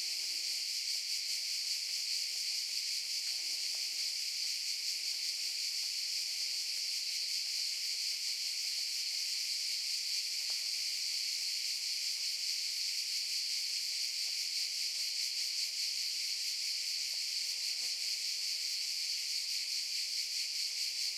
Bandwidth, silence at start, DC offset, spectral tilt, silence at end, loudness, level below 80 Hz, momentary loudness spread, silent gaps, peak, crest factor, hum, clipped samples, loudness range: 16.5 kHz; 0 s; under 0.1%; 6.5 dB/octave; 0 s; -34 LUFS; under -90 dBFS; 1 LU; none; -22 dBFS; 14 dB; none; under 0.1%; 1 LU